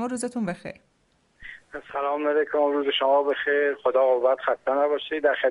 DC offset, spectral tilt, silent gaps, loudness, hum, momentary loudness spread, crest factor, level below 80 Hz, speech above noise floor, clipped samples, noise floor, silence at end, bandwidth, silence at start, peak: under 0.1%; -4 dB/octave; none; -24 LUFS; none; 17 LU; 16 dB; -64 dBFS; 42 dB; under 0.1%; -66 dBFS; 0 s; 11.5 kHz; 0 s; -8 dBFS